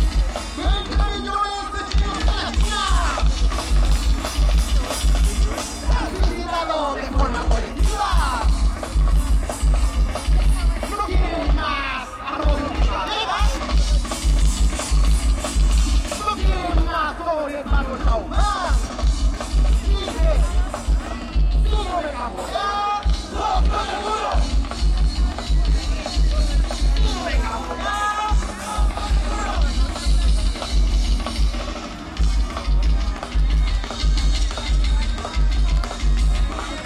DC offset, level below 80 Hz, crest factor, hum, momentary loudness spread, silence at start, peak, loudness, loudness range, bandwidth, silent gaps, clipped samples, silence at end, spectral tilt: under 0.1%; -20 dBFS; 14 dB; none; 4 LU; 0 s; -6 dBFS; -22 LUFS; 2 LU; 12 kHz; none; under 0.1%; 0 s; -5 dB/octave